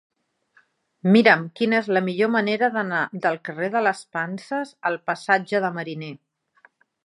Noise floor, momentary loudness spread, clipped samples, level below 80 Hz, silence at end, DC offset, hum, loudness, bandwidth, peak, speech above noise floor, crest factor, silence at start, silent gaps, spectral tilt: -62 dBFS; 12 LU; under 0.1%; -78 dBFS; 0.9 s; under 0.1%; none; -22 LUFS; 11 kHz; -2 dBFS; 40 dB; 22 dB; 1.05 s; none; -6 dB/octave